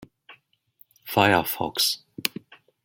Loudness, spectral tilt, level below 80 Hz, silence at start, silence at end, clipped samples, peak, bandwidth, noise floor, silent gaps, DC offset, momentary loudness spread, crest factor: -23 LUFS; -3 dB/octave; -64 dBFS; 0.3 s; 0.55 s; under 0.1%; 0 dBFS; 17 kHz; -60 dBFS; none; under 0.1%; 16 LU; 26 dB